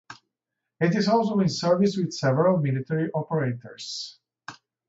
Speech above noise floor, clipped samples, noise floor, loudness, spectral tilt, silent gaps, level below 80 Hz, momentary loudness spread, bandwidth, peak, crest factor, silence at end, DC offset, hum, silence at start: 61 dB; under 0.1%; -85 dBFS; -24 LUFS; -6.5 dB/octave; none; -66 dBFS; 18 LU; 8 kHz; -8 dBFS; 16 dB; 0.35 s; under 0.1%; none; 0.1 s